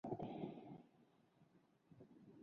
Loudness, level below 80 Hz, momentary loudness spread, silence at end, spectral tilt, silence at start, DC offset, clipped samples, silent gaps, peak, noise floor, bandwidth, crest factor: -52 LUFS; -80 dBFS; 17 LU; 0 s; -8 dB/octave; 0.05 s; under 0.1%; under 0.1%; none; -32 dBFS; -74 dBFS; 6.6 kHz; 22 dB